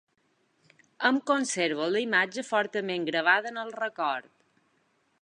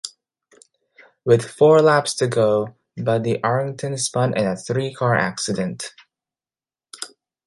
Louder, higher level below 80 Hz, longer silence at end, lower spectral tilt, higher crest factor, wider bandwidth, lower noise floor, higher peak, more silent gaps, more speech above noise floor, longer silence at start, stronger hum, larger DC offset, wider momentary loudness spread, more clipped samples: second, -27 LUFS vs -20 LUFS; second, -84 dBFS vs -60 dBFS; first, 1 s vs 0.4 s; second, -3 dB/octave vs -5 dB/octave; about the same, 22 dB vs 20 dB; about the same, 10.5 kHz vs 11.5 kHz; second, -71 dBFS vs under -90 dBFS; second, -8 dBFS vs -2 dBFS; neither; second, 44 dB vs over 71 dB; first, 1 s vs 0.05 s; neither; neither; second, 8 LU vs 19 LU; neither